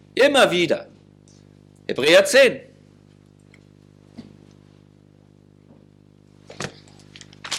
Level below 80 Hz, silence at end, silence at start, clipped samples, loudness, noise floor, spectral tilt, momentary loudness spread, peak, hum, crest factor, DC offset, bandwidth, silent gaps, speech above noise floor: -64 dBFS; 0 s; 0.15 s; under 0.1%; -17 LUFS; -52 dBFS; -3 dB/octave; 22 LU; -2 dBFS; 50 Hz at -50 dBFS; 20 dB; under 0.1%; 16 kHz; none; 36 dB